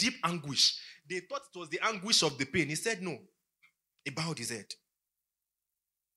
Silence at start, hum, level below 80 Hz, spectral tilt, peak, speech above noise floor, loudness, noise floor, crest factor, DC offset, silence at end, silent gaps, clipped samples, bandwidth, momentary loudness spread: 0 s; none; -70 dBFS; -2.5 dB/octave; -12 dBFS; 56 dB; -31 LUFS; -90 dBFS; 24 dB; under 0.1%; 1.4 s; none; under 0.1%; 15.5 kHz; 16 LU